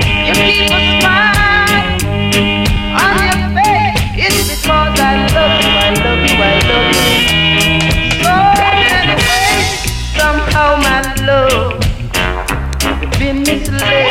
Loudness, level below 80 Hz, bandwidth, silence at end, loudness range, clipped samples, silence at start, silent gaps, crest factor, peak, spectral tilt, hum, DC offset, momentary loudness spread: -10 LUFS; -22 dBFS; 17 kHz; 0 s; 4 LU; under 0.1%; 0 s; none; 12 dB; 0 dBFS; -3.5 dB/octave; none; under 0.1%; 6 LU